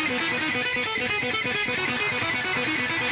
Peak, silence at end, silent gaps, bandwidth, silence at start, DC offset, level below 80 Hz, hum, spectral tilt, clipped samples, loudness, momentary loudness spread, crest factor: -14 dBFS; 0 s; none; 4 kHz; 0 s; under 0.1%; -56 dBFS; none; -1 dB/octave; under 0.1%; -24 LUFS; 0 LU; 12 dB